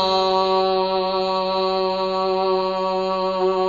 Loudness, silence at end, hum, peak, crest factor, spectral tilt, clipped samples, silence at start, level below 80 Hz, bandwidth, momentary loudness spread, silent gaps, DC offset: -20 LUFS; 0 s; none; -6 dBFS; 14 dB; -5.5 dB/octave; under 0.1%; 0 s; -54 dBFS; 7.4 kHz; 3 LU; none; 0.2%